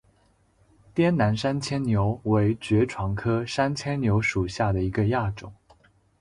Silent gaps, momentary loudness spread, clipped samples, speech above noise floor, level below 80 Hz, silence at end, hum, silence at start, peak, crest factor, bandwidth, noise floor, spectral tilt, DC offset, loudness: none; 5 LU; under 0.1%; 39 dB; -46 dBFS; 0.7 s; none; 0.95 s; -10 dBFS; 16 dB; 11 kHz; -63 dBFS; -7 dB/octave; under 0.1%; -25 LUFS